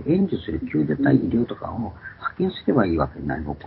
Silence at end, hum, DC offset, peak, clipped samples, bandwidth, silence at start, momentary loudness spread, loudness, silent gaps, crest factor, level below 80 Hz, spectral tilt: 0 s; none; under 0.1%; -4 dBFS; under 0.1%; 5.4 kHz; 0 s; 12 LU; -23 LUFS; none; 20 dB; -42 dBFS; -12.5 dB/octave